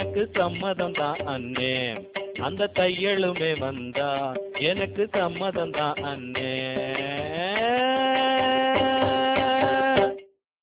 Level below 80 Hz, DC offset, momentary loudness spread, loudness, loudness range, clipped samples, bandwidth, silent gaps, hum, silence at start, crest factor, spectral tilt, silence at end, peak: -54 dBFS; under 0.1%; 8 LU; -25 LUFS; 5 LU; under 0.1%; 4 kHz; none; none; 0 s; 18 dB; -8.5 dB/octave; 0.35 s; -8 dBFS